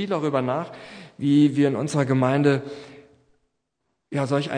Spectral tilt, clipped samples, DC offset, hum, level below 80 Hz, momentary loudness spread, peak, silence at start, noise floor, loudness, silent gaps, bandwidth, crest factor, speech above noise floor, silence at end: -7 dB/octave; under 0.1%; under 0.1%; none; -68 dBFS; 19 LU; -6 dBFS; 0 s; -77 dBFS; -22 LUFS; none; 10 kHz; 16 dB; 55 dB; 0 s